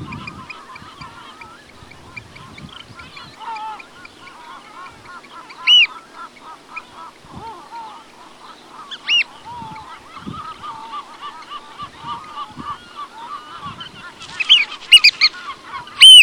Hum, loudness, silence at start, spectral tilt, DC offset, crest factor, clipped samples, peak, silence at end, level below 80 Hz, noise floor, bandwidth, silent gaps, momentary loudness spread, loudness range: none; -10 LUFS; 0 s; 1 dB/octave; under 0.1%; 18 dB; under 0.1%; 0 dBFS; 0 s; -56 dBFS; -41 dBFS; 19 kHz; none; 27 LU; 20 LU